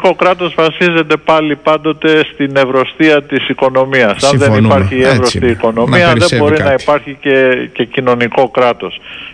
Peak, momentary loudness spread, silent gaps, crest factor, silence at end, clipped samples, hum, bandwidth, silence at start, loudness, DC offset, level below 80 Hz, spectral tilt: 0 dBFS; 4 LU; none; 10 dB; 0 s; under 0.1%; none; 10.5 kHz; 0 s; -10 LUFS; under 0.1%; -40 dBFS; -5.5 dB/octave